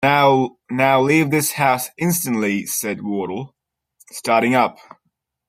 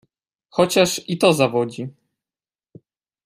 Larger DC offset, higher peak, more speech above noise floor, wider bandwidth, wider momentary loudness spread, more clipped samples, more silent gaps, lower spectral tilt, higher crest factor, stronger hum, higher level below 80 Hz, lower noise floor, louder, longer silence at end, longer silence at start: neither; about the same, -2 dBFS vs -2 dBFS; second, 54 dB vs over 72 dB; about the same, 16 kHz vs 15.5 kHz; about the same, 12 LU vs 14 LU; neither; neither; about the same, -4.5 dB/octave vs -4.5 dB/octave; about the same, 18 dB vs 20 dB; neither; about the same, -62 dBFS vs -60 dBFS; second, -73 dBFS vs under -90 dBFS; about the same, -18 LUFS vs -19 LUFS; second, 0.75 s vs 1.35 s; second, 0 s vs 0.55 s